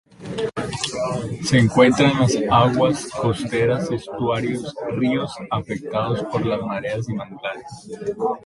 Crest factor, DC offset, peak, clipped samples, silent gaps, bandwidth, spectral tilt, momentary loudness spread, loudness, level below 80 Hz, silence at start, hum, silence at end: 18 dB; under 0.1%; -2 dBFS; under 0.1%; none; 11.5 kHz; -5.5 dB/octave; 13 LU; -21 LUFS; -48 dBFS; 0.2 s; none; 0 s